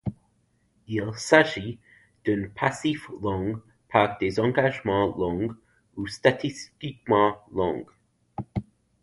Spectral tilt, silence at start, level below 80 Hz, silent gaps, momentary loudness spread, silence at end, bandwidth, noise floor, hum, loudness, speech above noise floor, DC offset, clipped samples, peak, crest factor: -5.5 dB/octave; 0.05 s; -52 dBFS; none; 15 LU; 0.4 s; 11.5 kHz; -68 dBFS; none; -26 LUFS; 43 dB; under 0.1%; under 0.1%; -2 dBFS; 24 dB